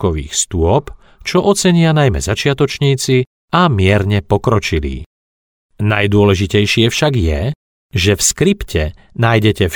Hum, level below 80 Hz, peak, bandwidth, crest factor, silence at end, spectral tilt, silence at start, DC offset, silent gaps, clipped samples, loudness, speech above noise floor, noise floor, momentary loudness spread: none; -30 dBFS; 0 dBFS; 18.5 kHz; 14 dB; 0 s; -5 dB/octave; 0 s; under 0.1%; 3.27-3.48 s, 5.06-5.69 s, 7.55-7.89 s; under 0.1%; -14 LUFS; over 77 dB; under -90 dBFS; 8 LU